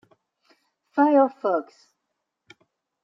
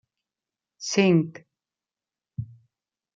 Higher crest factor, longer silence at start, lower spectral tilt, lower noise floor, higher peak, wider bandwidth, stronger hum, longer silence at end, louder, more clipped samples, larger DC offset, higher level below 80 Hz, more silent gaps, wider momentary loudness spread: about the same, 20 dB vs 22 dB; first, 0.95 s vs 0.8 s; first, -7 dB/octave vs -5.5 dB/octave; second, -80 dBFS vs under -90 dBFS; about the same, -6 dBFS vs -6 dBFS; second, 6 kHz vs 7.6 kHz; neither; first, 1.4 s vs 0.7 s; about the same, -22 LUFS vs -23 LUFS; neither; neither; second, -88 dBFS vs -66 dBFS; neither; second, 10 LU vs 20 LU